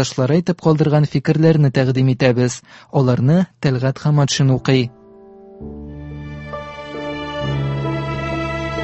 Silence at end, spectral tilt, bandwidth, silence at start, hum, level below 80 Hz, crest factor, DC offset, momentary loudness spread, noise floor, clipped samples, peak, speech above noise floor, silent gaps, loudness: 0 s; -6.5 dB/octave; 8.4 kHz; 0 s; none; -40 dBFS; 18 dB; under 0.1%; 17 LU; -42 dBFS; under 0.1%; 0 dBFS; 27 dB; none; -17 LUFS